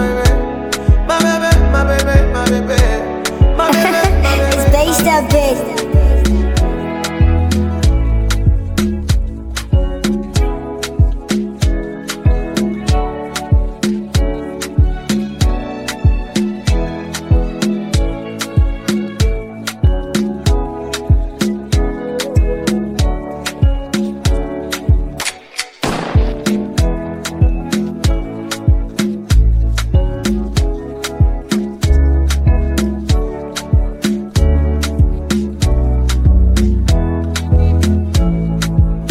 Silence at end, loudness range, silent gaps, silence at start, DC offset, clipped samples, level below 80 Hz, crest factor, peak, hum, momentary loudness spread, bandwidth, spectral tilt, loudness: 0 s; 5 LU; none; 0 s; 0.2%; under 0.1%; -16 dBFS; 14 dB; 0 dBFS; none; 8 LU; 18 kHz; -6 dB/octave; -16 LUFS